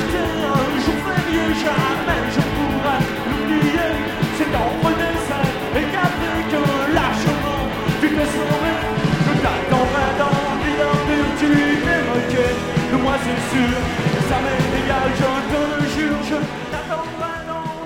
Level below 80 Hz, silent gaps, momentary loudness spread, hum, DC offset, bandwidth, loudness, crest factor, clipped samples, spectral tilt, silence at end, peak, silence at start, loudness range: -34 dBFS; none; 4 LU; none; under 0.1%; 18 kHz; -19 LUFS; 16 dB; under 0.1%; -5.5 dB/octave; 0 s; -2 dBFS; 0 s; 2 LU